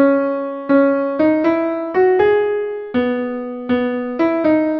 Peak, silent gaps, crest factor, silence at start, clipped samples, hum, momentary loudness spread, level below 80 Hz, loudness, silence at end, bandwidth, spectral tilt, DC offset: -2 dBFS; none; 14 dB; 0 s; under 0.1%; none; 8 LU; -54 dBFS; -17 LUFS; 0 s; 5.8 kHz; -8.5 dB/octave; under 0.1%